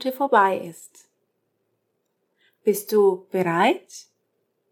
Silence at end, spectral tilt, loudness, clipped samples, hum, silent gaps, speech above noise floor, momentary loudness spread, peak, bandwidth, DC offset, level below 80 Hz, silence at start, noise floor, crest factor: 0.7 s; -5 dB/octave; -21 LUFS; under 0.1%; none; none; 52 dB; 18 LU; -4 dBFS; 19 kHz; under 0.1%; -88 dBFS; 0 s; -74 dBFS; 20 dB